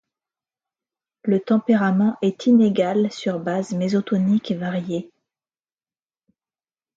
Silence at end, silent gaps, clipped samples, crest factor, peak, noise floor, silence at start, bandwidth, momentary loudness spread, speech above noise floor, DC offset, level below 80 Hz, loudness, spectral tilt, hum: 1.9 s; none; under 0.1%; 16 dB; -6 dBFS; under -90 dBFS; 1.25 s; 7.8 kHz; 9 LU; over 70 dB; under 0.1%; -68 dBFS; -21 LUFS; -7.5 dB/octave; none